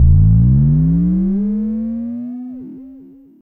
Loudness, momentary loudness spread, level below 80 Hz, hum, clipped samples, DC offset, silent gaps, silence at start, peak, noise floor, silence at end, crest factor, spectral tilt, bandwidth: -15 LUFS; 20 LU; -22 dBFS; none; under 0.1%; under 0.1%; none; 0 s; -2 dBFS; -40 dBFS; 0.4 s; 12 dB; -14.5 dB/octave; 1.9 kHz